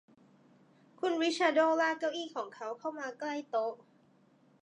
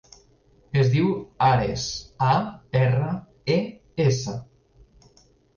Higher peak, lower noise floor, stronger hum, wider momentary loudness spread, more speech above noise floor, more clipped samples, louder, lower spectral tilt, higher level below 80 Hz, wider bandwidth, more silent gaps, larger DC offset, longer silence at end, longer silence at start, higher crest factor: second, -14 dBFS vs -10 dBFS; first, -66 dBFS vs -58 dBFS; neither; about the same, 12 LU vs 10 LU; about the same, 33 dB vs 36 dB; neither; second, -33 LUFS vs -24 LUFS; second, -2.5 dB/octave vs -6 dB/octave; second, under -90 dBFS vs -50 dBFS; first, 10.5 kHz vs 7.2 kHz; neither; neither; second, 0.85 s vs 1.15 s; first, 1 s vs 0.75 s; about the same, 20 dB vs 16 dB